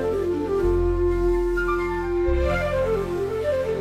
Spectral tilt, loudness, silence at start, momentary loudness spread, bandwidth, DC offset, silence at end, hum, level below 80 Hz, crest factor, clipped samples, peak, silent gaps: -7.5 dB/octave; -23 LUFS; 0 s; 3 LU; 13 kHz; under 0.1%; 0 s; none; -30 dBFS; 10 dB; under 0.1%; -12 dBFS; none